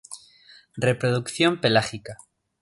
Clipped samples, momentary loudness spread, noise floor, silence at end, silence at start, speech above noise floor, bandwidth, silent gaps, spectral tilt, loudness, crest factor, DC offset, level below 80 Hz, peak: under 0.1%; 21 LU; -53 dBFS; 0.45 s; 0.1 s; 30 dB; 11.5 kHz; none; -5 dB/octave; -23 LUFS; 20 dB; under 0.1%; -60 dBFS; -4 dBFS